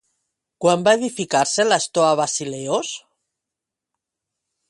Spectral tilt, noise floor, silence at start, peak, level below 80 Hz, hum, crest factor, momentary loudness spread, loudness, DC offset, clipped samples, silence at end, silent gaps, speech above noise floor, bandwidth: -3 dB/octave; -85 dBFS; 0.6 s; -2 dBFS; -68 dBFS; none; 20 dB; 7 LU; -19 LUFS; under 0.1%; under 0.1%; 1.7 s; none; 66 dB; 11.5 kHz